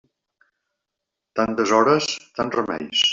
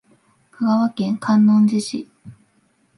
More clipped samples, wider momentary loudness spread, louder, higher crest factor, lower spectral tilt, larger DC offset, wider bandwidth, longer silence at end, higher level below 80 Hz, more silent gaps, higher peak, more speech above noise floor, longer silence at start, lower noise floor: neither; second, 9 LU vs 15 LU; second, -21 LUFS vs -18 LUFS; about the same, 18 dB vs 14 dB; second, -3 dB/octave vs -6.5 dB/octave; neither; second, 7.8 kHz vs 11.5 kHz; second, 0 s vs 0.65 s; first, -60 dBFS vs -66 dBFS; neither; about the same, -4 dBFS vs -6 dBFS; first, 63 dB vs 45 dB; first, 1.35 s vs 0.6 s; first, -83 dBFS vs -62 dBFS